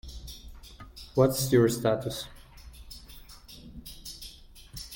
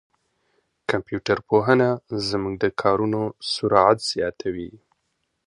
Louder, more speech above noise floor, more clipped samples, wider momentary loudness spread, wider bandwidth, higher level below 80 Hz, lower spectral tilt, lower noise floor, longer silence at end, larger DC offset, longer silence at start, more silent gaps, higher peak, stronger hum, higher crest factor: second, -26 LUFS vs -22 LUFS; second, 24 dB vs 52 dB; neither; first, 25 LU vs 12 LU; first, 17 kHz vs 11 kHz; about the same, -50 dBFS vs -54 dBFS; about the same, -5.5 dB/octave vs -5.5 dB/octave; second, -49 dBFS vs -74 dBFS; second, 0 s vs 0.7 s; neither; second, 0.05 s vs 0.9 s; neither; second, -10 dBFS vs 0 dBFS; neither; about the same, 22 dB vs 22 dB